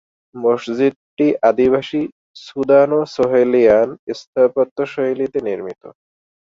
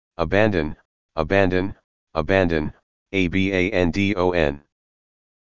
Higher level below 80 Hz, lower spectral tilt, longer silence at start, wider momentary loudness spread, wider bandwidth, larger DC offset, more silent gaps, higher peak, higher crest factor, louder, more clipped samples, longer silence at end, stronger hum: second, -56 dBFS vs -38 dBFS; about the same, -7 dB/octave vs -7 dB/octave; first, 0.35 s vs 0.1 s; about the same, 12 LU vs 12 LU; about the same, 7.6 kHz vs 7.6 kHz; second, under 0.1% vs 2%; second, 0.96-1.17 s, 2.12-2.34 s, 3.99-4.07 s, 4.27-4.33 s, 4.71-4.76 s vs 0.85-1.09 s, 1.84-2.07 s, 2.83-3.06 s; about the same, -2 dBFS vs -2 dBFS; about the same, 16 dB vs 20 dB; first, -17 LUFS vs -21 LUFS; neither; second, 0.55 s vs 0.7 s; neither